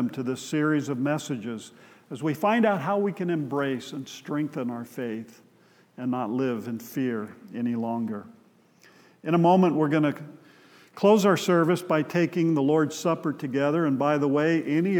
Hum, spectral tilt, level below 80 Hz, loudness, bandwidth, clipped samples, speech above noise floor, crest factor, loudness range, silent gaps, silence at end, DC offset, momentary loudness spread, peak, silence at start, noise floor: none; -6.5 dB/octave; -86 dBFS; -25 LUFS; 18.5 kHz; under 0.1%; 34 dB; 18 dB; 8 LU; none; 0 s; under 0.1%; 13 LU; -8 dBFS; 0 s; -59 dBFS